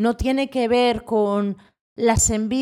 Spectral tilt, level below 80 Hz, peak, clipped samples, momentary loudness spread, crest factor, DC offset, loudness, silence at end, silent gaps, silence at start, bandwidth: -4 dB/octave; -38 dBFS; -6 dBFS; under 0.1%; 6 LU; 14 dB; under 0.1%; -20 LUFS; 0 s; 1.81-1.96 s; 0 s; 16.5 kHz